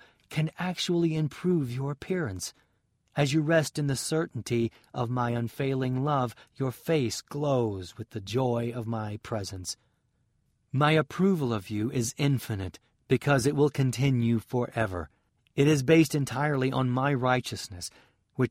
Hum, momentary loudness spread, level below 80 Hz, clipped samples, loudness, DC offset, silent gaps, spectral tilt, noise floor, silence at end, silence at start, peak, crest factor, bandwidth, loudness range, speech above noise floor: none; 12 LU; -60 dBFS; under 0.1%; -28 LUFS; under 0.1%; none; -6 dB/octave; -72 dBFS; 0 s; 0.3 s; -10 dBFS; 18 dB; 16 kHz; 4 LU; 44 dB